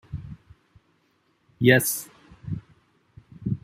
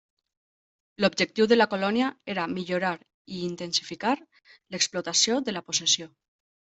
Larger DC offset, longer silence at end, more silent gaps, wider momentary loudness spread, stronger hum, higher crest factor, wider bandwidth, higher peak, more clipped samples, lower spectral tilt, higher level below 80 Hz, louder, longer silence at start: neither; second, 0.05 s vs 0.75 s; second, none vs 3.14-3.25 s; first, 26 LU vs 12 LU; neither; about the same, 24 dB vs 22 dB; first, 16 kHz vs 8.4 kHz; about the same, -4 dBFS vs -6 dBFS; neither; first, -4.5 dB/octave vs -2.5 dB/octave; first, -54 dBFS vs -70 dBFS; about the same, -24 LUFS vs -26 LUFS; second, 0.1 s vs 1 s